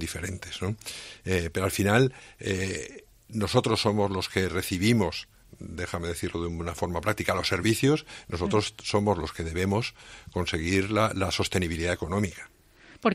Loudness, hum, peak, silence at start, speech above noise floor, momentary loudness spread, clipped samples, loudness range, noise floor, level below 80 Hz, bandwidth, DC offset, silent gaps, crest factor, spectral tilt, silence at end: -28 LUFS; none; -6 dBFS; 0 s; 23 dB; 13 LU; under 0.1%; 2 LU; -51 dBFS; -50 dBFS; 16 kHz; under 0.1%; none; 22 dB; -5 dB/octave; 0 s